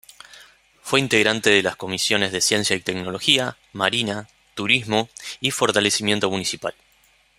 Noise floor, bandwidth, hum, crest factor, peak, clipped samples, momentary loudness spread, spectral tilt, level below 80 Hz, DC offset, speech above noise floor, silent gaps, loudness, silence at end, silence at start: -59 dBFS; 16 kHz; none; 22 dB; 0 dBFS; under 0.1%; 12 LU; -2.5 dB/octave; -60 dBFS; under 0.1%; 37 dB; none; -20 LUFS; 0.65 s; 0.35 s